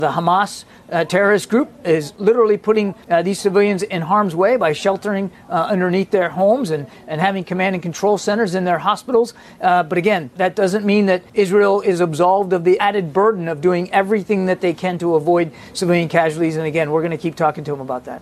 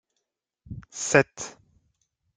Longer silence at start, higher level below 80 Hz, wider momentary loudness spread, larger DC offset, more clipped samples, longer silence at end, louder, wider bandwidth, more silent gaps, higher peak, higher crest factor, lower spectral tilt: second, 0 s vs 0.7 s; about the same, -58 dBFS vs -58 dBFS; second, 6 LU vs 22 LU; neither; neither; second, 0.05 s vs 0.85 s; first, -17 LUFS vs -23 LUFS; first, 13.5 kHz vs 10 kHz; neither; first, 0 dBFS vs -4 dBFS; second, 16 dB vs 26 dB; first, -6 dB/octave vs -4 dB/octave